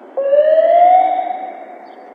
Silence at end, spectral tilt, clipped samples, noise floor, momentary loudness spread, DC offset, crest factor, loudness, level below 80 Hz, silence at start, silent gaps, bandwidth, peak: 0.05 s; -5 dB/octave; under 0.1%; -36 dBFS; 18 LU; under 0.1%; 12 dB; -12 LUFS; under -90 dBFS; 0.15 s; none; 4.3 kHz; -2 dBFS